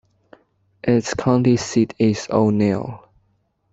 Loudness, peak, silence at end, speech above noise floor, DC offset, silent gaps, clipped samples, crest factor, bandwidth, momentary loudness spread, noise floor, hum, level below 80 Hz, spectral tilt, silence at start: -19 LUFS; -2 dBFS; 0.75 s; 47 dB; under 0.1%; none; under 0.1%; 18 dB; 8 kHz; 8 LU; -65 dBFS; none; -52 dBFS; -6.5 dB/octave; 0.85 s